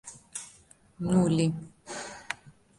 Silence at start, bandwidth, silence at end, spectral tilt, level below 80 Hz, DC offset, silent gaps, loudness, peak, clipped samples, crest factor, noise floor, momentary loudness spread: 0.05 s; 11.5 kHz; 0.3 s; -6 dB/octave; -58 dBFS; under 0.1%; none; -30 LUFS; -12 dBFS; under 0.1%; 20 dB; -58 dBFS; 16 LU